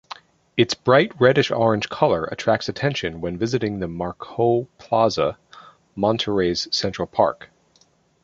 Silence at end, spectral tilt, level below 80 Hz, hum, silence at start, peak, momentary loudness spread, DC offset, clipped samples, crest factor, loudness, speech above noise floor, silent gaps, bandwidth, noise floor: 0.9 s; -5.5 dB/octave; -50 dBFS; none; 0.55 s; -2 dBFS; 11 LU; under 0.1%; under 0.1%; 20 dB; -21 LUFS; 39 dB; none; 7.8 kHz; -60 dBFS